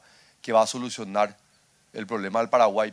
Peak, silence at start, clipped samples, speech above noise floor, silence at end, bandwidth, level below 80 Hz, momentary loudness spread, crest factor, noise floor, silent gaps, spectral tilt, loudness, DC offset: -8 dBFS; 0.45 s; under 0.1%; 39 dB; 0 s; 11 kHz; -74 dBFS; 17 LU; 18 dB; -63 dBFS; none; -4 dB/octave; -25 LUFS; under 0.1%